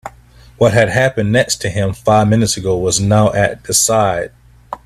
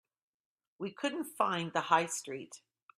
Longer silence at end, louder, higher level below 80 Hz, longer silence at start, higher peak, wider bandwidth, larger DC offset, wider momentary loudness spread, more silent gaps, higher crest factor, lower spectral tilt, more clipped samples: second, 0.1 s vs 0.4 s; first, -14 LUFS vs -34 LUFS; first, -40 dBFS vs -82 dBFS; second, 0.05 s vs 0.8 s; first, 0 dBFS vs -12 dBFS; about the same, 15.5 kHz vs 15.5 kHz; neither; second, 7 LU vs 15 LU; neither; second, 14 dB vs 24 dB; about the same, -4.5 dB/octave vs -3.5 dB/octave; neither